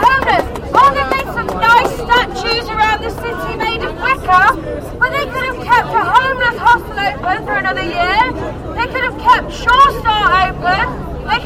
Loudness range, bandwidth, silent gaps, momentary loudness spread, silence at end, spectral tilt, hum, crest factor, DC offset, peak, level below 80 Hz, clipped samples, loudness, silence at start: 2 LU; 16.5 kHz; none; 9 LU; 0 s; -4.5 dB/octave; none; 14 dB; under 0.1%; 0 dBFS; -30 dBFS; under 0.1%; -13 LUFS; 0 s